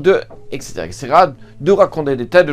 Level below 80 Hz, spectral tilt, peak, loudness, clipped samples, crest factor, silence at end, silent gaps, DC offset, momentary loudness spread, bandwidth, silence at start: -44 dBFS; -5.5 dB/octave; 0 dBFS; -14 LUFS; under 0.1%; 14 dB; 0 s; none; under 0.1%; 15 LU; 14 kHz; 0 s